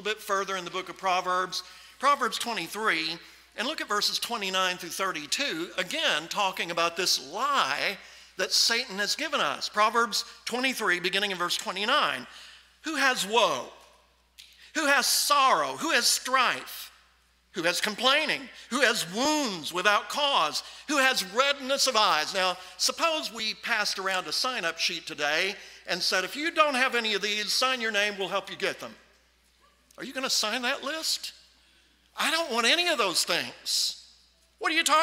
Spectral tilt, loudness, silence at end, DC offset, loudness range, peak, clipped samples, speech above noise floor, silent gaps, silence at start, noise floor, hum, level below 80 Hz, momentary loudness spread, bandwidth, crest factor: -1 dB/octave; -26 LUFS; 0 s; under 0.1%; 4 LU; -6 dBFS; under 0.1%; 36 dB; none; 0 s; -64 dBFS; none; -70 dBFS; 10 LU; 16 kHz; 22 dB